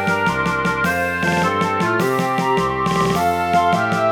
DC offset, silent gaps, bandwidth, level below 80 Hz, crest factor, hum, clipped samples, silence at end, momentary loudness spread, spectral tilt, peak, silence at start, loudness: 0.1%; none; 19.5 kHz; -44 dBFS; 14 dB; none; under 0.1%; 0 s; 2 LU; -5.5 dB/octave; -4 dBFS; 0 s; -18 LUFS